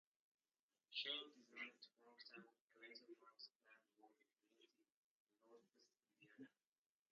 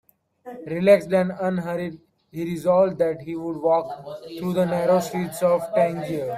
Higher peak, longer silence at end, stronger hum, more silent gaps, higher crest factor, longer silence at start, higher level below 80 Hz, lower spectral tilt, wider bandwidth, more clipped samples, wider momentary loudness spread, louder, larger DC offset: second, -36 dBFS vs -4 dBFS; first, 0.65 s vs 0 s; neither; first, 2.61-2.68 s, 3.55-3.60 s, 4.92-5.27 s vs none; first, 26 dB vs 18 dB; first, 0.9 s vs 0.45 s; second, under -90 dBFS vs -62 dBFS; second, 1.5 dB/octave vs -7 dB/octave; second, 7 kHz vs 15.5 kHz; neither; first, 19 LU vs 16 LU; second, -54 LUFS vs -22 LUFS; neither